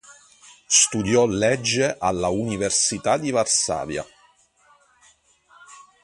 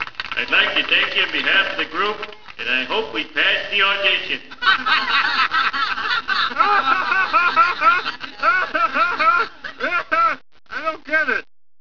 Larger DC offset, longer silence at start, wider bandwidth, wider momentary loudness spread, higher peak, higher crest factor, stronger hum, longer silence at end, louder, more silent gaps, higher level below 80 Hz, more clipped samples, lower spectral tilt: second, under 0.1% vs 1%; about the same, 0.1 s vs 0 s; first, 11.5 kHz vs 5.4 kHz; about the same, 9 LU vs 10 LU; about the same, -2 dBFS vs 0 dBFS; about the same, 22 dB vs 20 dB; neither; second, 0.2 s vs 0.35 s; about the same, -20 LUFS vs -18 LUFS; neither; about the same, -52 dBFS vs -54 dBFS; neither; about the same, -2.5 dB/octave vs -2 dB/octave